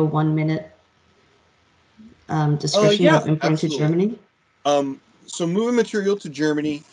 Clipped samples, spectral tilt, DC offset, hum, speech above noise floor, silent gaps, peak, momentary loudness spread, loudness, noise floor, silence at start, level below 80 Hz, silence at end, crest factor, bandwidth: under 0.1%; -6 dB/octave; under 0.1%; none; 40 dB; none; -4 dBFS; 11 LU; -20 LUFS; -59 dBFS; 0 s; -62 dBFS; 0.1 s; 18 dB; 10.5 kHz